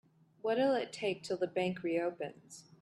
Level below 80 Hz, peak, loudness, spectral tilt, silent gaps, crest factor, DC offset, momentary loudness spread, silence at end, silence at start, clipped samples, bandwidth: -80 dBFS; -20 dBFS; -35 LUFS; -5.5 dB/octave; none; 16 dB; under 0.1%; 13 LU; 0.2 s; 0.45 s; under 0.1%; 12 kHz